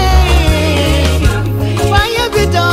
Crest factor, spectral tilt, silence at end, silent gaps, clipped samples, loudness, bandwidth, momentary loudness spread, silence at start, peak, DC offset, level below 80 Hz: 10 dB; -5 dB/octave; 0 s; none; under 0.1%; -12 LUFS; 16 kHz; 4 LU; 0 s; 0 dBFS; under 0.1%; -14 dBFS